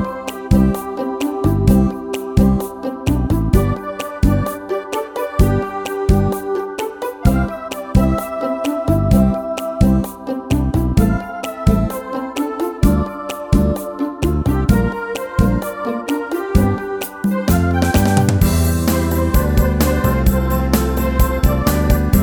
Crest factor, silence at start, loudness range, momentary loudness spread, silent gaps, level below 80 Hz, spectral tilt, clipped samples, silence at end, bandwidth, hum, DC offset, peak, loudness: 16 dB; 0 s; 3 LU; 9 LU; none; -22 dBFS; -7 dB/octave; under 0.1%; 0 s; over 20 kHz; none; under 0.1%; 0 dBFS; -18 LUFS